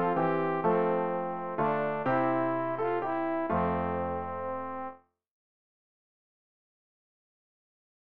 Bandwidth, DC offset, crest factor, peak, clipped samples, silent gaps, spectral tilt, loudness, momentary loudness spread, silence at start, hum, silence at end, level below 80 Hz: 5.2 kHz; 0.3%; 16 dB; -16 dBFS; under 0.1%; none; -6.5 dB/octave; -30 LUFS; 8 LU; 0 s; none; 2.8 s; -60 dBFS